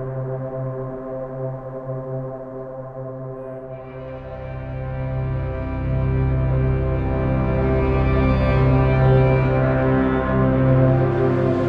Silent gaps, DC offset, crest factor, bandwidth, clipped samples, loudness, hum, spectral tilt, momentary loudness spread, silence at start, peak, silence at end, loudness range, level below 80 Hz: none; under 0.1%; 16 dB; 5 kHz; under 0.1%; -20 LUFS; none; -10.5 dB/octave; 16 LU; 0 s; -4 dBFS; 0 s; 14 LU; -28 dBFS